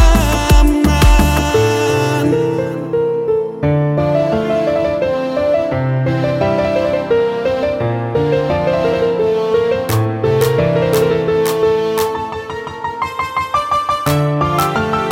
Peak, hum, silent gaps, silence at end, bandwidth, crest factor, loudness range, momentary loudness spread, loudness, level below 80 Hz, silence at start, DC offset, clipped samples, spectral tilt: 0 dBFS; none; none; 0 s; 17 kHz; 14 dB; 2 LU; 6 LU; -15 LUFS; -22 dBFS; 0 s; under 0.1%; under 0.1%; -6 dB/octave